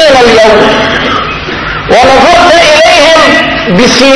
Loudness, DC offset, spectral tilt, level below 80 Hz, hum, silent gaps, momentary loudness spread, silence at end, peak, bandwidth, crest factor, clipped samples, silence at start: -3 LUFS; under 0.1%; -3.5 dB/octave; -26 dBFS; none; none; 9 LU; 0 s; 0 dBFS; 11 kHz; 4 dB; 20%; 0 s